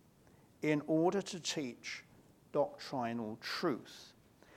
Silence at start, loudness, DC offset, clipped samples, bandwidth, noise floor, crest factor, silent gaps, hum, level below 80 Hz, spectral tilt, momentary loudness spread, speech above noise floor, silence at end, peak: 0.6 s; -37 LUFS; under 0.1%; under 0.1%; 16 kHz; -65 dBFS; 20 dB; none; none; -78 dBFS; -4.5 dB/octave; 13 LU; 28 dB; 0.45 s; -18 dBFS